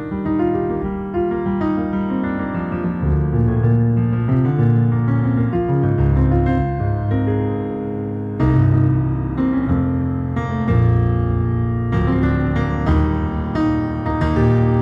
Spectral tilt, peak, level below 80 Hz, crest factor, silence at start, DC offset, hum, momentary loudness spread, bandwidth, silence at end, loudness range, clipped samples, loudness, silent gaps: -10.5 dB/octave; -4 dBFS; -28 dBFS; 14 dB; 0 s; under 0.1%; none; 6 LU; 5.6 kHz; 0 s; 2 LU; under 0.1%; -18 LUFS; none